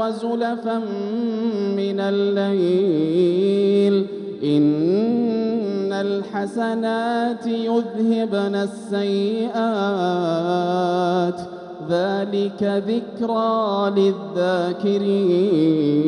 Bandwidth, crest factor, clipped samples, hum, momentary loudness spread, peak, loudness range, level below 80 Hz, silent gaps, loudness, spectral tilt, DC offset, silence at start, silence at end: 10.5 kHz; 12 dB; under 0.1%; none; 7 LU; -8 dBFS; 3 LU; -68 dBFS; none; -21 LUFS; -7.5 dB/octave; under 0.1%; 0 s; 0 s